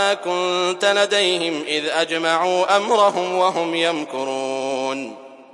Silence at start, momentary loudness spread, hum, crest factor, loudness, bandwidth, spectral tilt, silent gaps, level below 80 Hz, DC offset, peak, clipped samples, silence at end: 0 s; 8 LU; none; 18 dB; -19 LUFS; 11.5 kHz; -2.5 dB/octave; none; -80 dBFS; under 0.1%; -2 dBFS; under 0.1%; 0.1 s